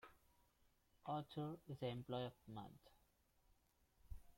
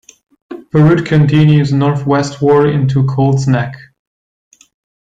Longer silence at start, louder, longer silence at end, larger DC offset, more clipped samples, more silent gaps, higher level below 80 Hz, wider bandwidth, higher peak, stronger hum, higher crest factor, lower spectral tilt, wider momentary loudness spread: second, 0.05 s vs 0.5 s; second, -50 LUFS vs -12 LUFS; second, 0 s vs 1.25 s; neither; neither; neither; second, -70 dBFS vs -46 dBFS; first, 16.5 kHz vs 7.8 kHz; second, -34 dBFS vs -2 dBFS; neither; first, 20 dB vs 12 dB; about the same, -7.5 dB/octave vs -8 dB/octave; first, 16 LU vs 7 LU